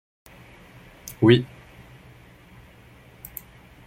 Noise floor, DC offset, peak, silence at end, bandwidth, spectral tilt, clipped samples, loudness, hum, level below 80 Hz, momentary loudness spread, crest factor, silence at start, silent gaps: -50 dBFS; under 0.1%; -2 dBFS; 2.4 s; 16.5 kHz; -6.5 dB/octave; under 0.1%; -19 LUFS; none; -56 dBFS; 26 LU; 24 dB; 1.05 s; none